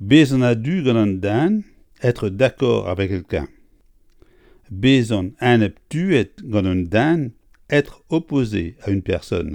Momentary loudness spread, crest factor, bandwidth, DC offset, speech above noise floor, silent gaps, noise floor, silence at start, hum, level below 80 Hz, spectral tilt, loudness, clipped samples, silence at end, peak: 8 LU; 18 dB; 16 kHz; under 0.1%; 35 dB; none; -54 dBFS; 0 s; none; -44 dBFS; -7 dB/octave; -19 LUFS; under 0.1%; 0 s; 0 dBFS